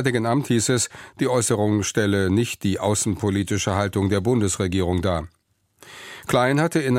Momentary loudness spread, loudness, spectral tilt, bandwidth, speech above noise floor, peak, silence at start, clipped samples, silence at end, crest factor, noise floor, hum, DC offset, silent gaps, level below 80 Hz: 7 LU; -22 LUFS; -5 dB/octave; 16.5 kHz; 34 dB; -6 dBFS; 0 s; under 0.1%; 0 s; 16 dB; -55 dBFS; none; under 0.1%; none; -48 dBFS